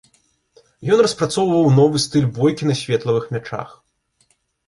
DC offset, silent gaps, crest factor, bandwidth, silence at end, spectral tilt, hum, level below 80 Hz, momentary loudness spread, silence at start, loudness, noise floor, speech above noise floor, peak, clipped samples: under 0.1%; none; 16 dB; 11.5 kHz; 1 s; -6 dB/octave; none; -56 dBFS; 15 LU; 0.8 s; -17 LUFS; -64 dBFS; 47 dB; -4 dBFS; under 0.1%